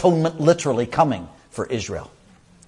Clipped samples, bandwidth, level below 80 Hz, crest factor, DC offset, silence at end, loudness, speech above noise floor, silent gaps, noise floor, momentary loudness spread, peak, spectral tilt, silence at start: under 0.1%; 11.5 kHz; -54 dBFS; 20 dB; under 0.1%; 0.6 s; -21 LUFS; 31 dB; none; -51 dBFS; 13 LU; -2 dBFS; -6 dB/octave; 0 s